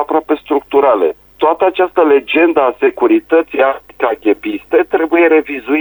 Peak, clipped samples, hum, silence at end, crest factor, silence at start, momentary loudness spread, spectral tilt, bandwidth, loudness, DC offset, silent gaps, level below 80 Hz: 0 dBFS; under 0.1%; none; 0 s; 12 dB; 0 s; 6 LU; -6.5 dB/octave; over 20 kHz; -13 LUFS; under 0.1%; none; -52 dBFS